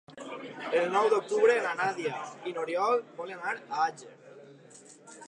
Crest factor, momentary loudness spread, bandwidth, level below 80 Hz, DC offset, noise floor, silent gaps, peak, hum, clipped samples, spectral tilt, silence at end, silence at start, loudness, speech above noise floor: 20 dB; 17 LU; 10.5 kHz; -88 dBFS; under 0.1%; -53 dBFS; none; -12 dBFS; none; under 0.1%; -4 dB/octave; 0 s; 0.1 s; -29 LUFS; 25 dB